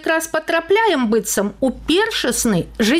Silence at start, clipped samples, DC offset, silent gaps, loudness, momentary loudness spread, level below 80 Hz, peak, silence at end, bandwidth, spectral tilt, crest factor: 0 s; under 0.1%; under 0.1%; none; -18 LUFS; 5 LU; -42 dBFS; -6 dBFS; 0 s; 16 kHz; -3.5 dB/octave; 12 dB